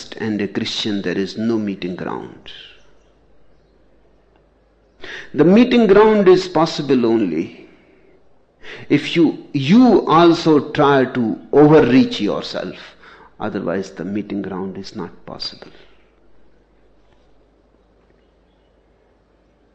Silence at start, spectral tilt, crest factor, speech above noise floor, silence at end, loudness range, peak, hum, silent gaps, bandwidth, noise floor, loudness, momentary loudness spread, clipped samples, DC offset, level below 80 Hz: 0 s; -6.5 dB/octave; 18 dB; 40 dB; 4.25 s; 19 LU; 0 dBFS; none; none; 8.2 kHz; -56 dBFS; -16 LUFS; 20 LU; under 0.1%; under 0.1%; -50 dBFS